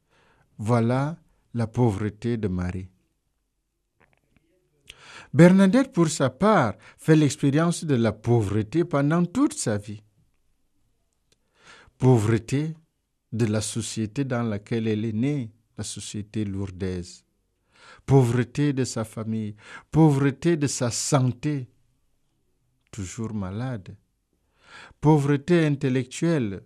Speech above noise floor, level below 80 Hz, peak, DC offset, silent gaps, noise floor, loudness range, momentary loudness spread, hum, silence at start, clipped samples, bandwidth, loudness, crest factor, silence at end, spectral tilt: 53 dB; -56 dBFS; -2 dBFS; under 0.1%; none; -76 dBFS; 9 LU; 16 LU; none; 0.6 s; under 0.1%; 13.5 kHz; -24 LUFS; 22 dB; 0.05 s; -6.5 dB/octave